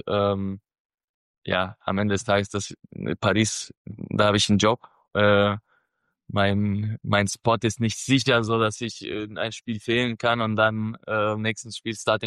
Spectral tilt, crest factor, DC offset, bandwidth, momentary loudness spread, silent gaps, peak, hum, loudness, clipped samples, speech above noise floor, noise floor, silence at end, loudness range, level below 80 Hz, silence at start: -4.5 dB/octave; 18 dB; under 0.1%; 12.5 kHz; 12 LU; 0.80-0.98 s, 1.04-1.42 s, 3.77-3.85 s; -8 dBFS; none; -24 LUFS; under 0.1%; 51 dB; -75 dBFS; 0 s; 3 LU; -56 dBFS; 0.05 s